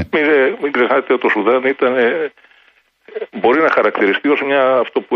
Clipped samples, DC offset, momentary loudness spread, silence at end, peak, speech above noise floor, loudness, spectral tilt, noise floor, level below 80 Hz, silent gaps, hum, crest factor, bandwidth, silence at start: under 0.1%; under 0.1%; 8 LU; 0 s; -2 dBFS; 39 dB; -14 LUFS; -7 dB/octave; -54 dBFS; -56 dBFS; none; none; 14 dB; 6.2 kHz; 0 s